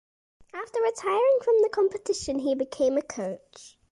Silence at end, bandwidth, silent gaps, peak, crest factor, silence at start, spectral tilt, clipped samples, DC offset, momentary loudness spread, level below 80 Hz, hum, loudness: 0.25 s; 11.5 kHz; none; -14 dBFS; 12 dB; 0.55 s; -4 dB/octave; under 0.1%; under 0.1%; 13 LU; -60 dBFS; none; -26 LUFS